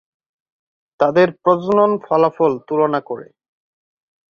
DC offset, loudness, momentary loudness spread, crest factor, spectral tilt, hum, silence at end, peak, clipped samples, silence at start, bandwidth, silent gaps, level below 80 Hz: under 0.1%; -16 LUFS; 7 LU; 18 dB; -8 dB/octave; none; 1.1 s; -2 dBFS; under 0.1%; 1 s; 7 kHz; none; -62 dBFS